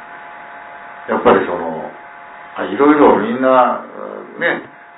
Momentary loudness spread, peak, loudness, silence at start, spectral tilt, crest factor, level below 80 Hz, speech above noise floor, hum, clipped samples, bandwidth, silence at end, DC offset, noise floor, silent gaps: 22 LU; 0 dBFS; -14 LUFS; 0 s; -10 dB/octave; 16 dB; -52 dBFS; 22 dB; none; under 0.1%; 4 kHz; 0.3 s; under 0.1%; -35 dBFS; none